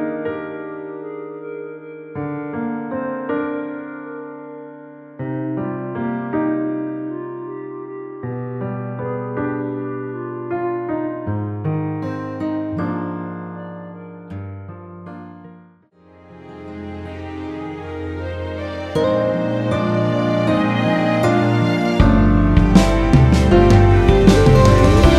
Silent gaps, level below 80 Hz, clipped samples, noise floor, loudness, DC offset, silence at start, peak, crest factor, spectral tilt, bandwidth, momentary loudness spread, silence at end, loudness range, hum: none; -26 dBFS; under 0.1%; -50 dBFS; -18 LUFS; under 0.1%; 0 s; 0 dBFS; 18 dB; -7.5 dB/octave; 12.5 kHz; 21 LU; 0 s; 18 LU; none